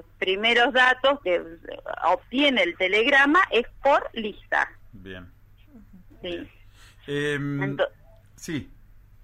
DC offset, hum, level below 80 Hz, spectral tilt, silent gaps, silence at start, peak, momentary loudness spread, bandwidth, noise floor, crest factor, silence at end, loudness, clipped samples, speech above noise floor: under 0.1%; none; -52 dBFS; -4.5 dB/octave; none; 0.2 s; -8 dBFS; 21 LU; 14 kHz; -50 dBFS; 16 dB; 0.6 s; -22 LUFS; under 0.1%; 27 dB